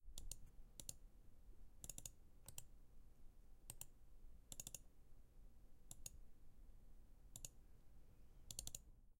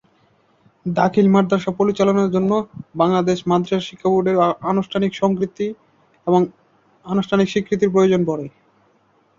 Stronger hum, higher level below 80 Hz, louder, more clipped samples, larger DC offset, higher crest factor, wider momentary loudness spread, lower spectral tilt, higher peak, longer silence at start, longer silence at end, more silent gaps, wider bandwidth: neither; second, -64 dBFS vs -58 dBFS; second, -57 LUFS vs -19 LUFS; neither; neither; first, 30 dB vs 16 dB; about the same, 9 LU vs 9 LU; second, -2 dB/octave vs -7 dB/octave; second, -28 dBFS vs -2 dBFS; second, 0 s vs 0.85 s; second, 0.05 s vs 0.9 s; neither; first, 16.5 kHz vs 7.4 kHz